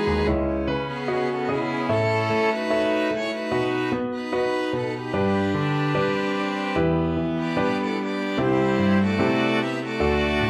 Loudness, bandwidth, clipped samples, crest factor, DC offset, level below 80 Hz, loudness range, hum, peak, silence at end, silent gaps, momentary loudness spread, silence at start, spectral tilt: -23 LUFS; 12 kHz; under 0.1%; 14 dB; under 0.1%; -40 dBFS; 2 LU; none; -10 dBFS; 0 s; none; 5 LU; 0 s; -7 dB/octave